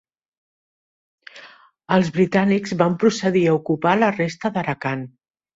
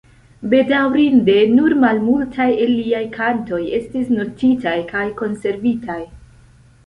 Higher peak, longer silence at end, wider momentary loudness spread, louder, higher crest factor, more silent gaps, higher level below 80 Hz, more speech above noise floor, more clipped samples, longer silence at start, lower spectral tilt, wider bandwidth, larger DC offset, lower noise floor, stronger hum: about the same, -4 dBFS vs -2 dBFS; second, 0.5 s vs 0.7 s; second, 7 LU vs 10 LU; second, -20 LUFS vs -17 LUFS; about the same, 18 dB vs 14 dB; neither; second, -60 dBFS vs -48 dBFS; about the same, 28 dB vs 31 dB; neither; first, 1.35 s vs 0.4 s; about the same, -6.5 dB/octave vs -7 dB/octave; second, 7.8 kHz vs 9 kHz; neither; about the same, -47 dBFS vs -47 dBFS; neither